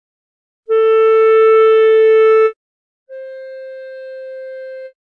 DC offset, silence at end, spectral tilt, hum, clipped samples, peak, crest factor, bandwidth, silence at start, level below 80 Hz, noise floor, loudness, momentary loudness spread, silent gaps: under 0.1%; 0.25 s; -2.5 dB/octave; none; under 0.1%; -4 dBFS; 10 dB; 4.2 kHz; 0.7 s; -84 dBFS; -30 dBFS; -10 LUFS; 22 LU; 2.56-3.06 s